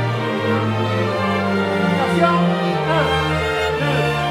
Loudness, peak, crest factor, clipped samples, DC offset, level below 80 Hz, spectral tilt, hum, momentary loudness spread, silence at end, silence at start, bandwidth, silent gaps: -18 LUFS; -4 dBFS; 14 dB; under 0.1%; under 0.1%; -40 dBFS; -6.5 dB/octave; none; 4 LU; 0 s; 0 s; 14.5 kHz; none